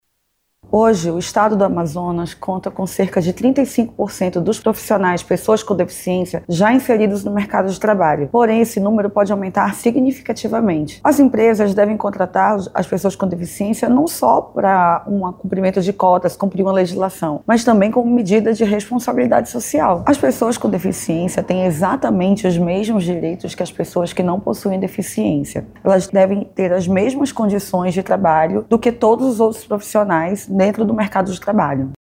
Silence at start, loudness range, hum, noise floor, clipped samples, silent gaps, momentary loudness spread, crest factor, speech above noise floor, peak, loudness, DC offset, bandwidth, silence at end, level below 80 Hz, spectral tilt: 0.7 s; 3 LU; none; -69 dBFS; under 0.1%; none; 7 LU; 14 dB; 53 dB; -2 dBFS; -17 LUFS; under 0.1%; 16.5 kHz; 0.15 s; -48 dBFS; -6.5 dB/octave